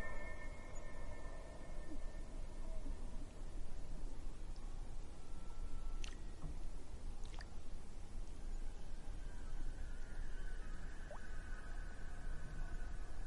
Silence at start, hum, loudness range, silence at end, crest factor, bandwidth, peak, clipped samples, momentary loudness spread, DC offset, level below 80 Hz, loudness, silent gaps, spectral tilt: 0 s; none; 1 LU; 0 s; 12 dB; 11 kHz; -28 dBFS; under 0.1%; 3 LU; under 0.1%; -46 dBFS; -53 LUFS; none; -5 dB/octave